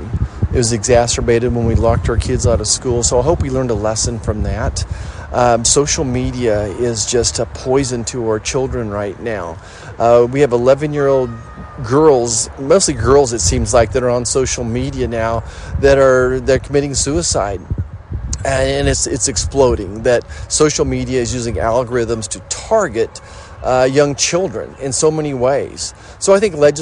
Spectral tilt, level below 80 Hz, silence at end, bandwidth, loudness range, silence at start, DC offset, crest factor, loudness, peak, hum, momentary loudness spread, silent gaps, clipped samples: -4.5 dB/octave; -28 dBFS; 0 s; 11 kHz; 3 LU; 0 s; under 0.1%; 16 dB; -15 LUFS; 0 dBFS; none; 11 LU; none; under 0.1%